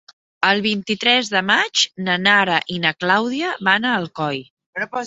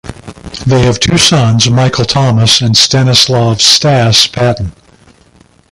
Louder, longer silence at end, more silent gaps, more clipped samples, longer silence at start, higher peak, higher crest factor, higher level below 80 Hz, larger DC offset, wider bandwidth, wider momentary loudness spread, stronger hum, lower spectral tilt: second, -18 LUFS vs -7 LUFS; second, 0 s vs 1 s; first, 4.50-4.57 s, 4.66-4.73 s vs none; second, under 0.1% vs 0.4%; first, 0.4 s vs 0.05 s; about the same, -2 dBFS vs 0 dBFS; first, 18 dB vs 10 dB; second, -64 dBFS vs -32 dBFS; neither; second, 8 kHz vs 16 kHz; about the same, 10 LU vs 10 LU; neither; about the same, -3 dB/octave vs -4 dB/octave